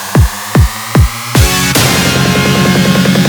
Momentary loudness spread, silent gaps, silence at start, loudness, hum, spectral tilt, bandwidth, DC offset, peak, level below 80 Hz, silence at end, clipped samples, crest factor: 3 LU; none; 0 s; -9 LUFS; none; -4.5 dB/octave; over 20 kHz; under 0.1%; 0 dBFS; -18 dBFS; 0 s; 0.2%; 10 dB